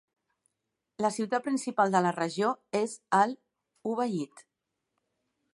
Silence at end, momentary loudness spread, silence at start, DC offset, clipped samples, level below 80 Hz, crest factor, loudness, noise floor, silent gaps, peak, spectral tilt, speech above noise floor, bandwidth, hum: 1.1 s; 10 LU; 1 s; under 0.1%; under 0.1%; -80 dBFS; 20 dB; -29 LUFS; -84 dBFS; none; -10 dBFS; -5 dB/octave; 56 dB; 11.5 kHz; none